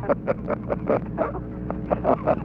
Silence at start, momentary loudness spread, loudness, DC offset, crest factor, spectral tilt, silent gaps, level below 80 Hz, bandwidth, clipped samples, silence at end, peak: 0 s; 9 LU; -26 LUFS; under 0.1%; 20 dB; -10.5 dB/octave; none; -40 dBFS; 5.6 kHz; under 0.1%; 0 s; -4 dBFS